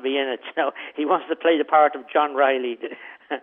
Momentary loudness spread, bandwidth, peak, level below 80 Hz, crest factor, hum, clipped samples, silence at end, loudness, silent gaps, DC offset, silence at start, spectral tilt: 14 LU; 3.8 kHz; -4 dBFS; -84 dBFS; 18 dB; none; under 0.1%; 0.05 s; -22 LUFS; none; under 0.1%; 0 s; -7 dB/octave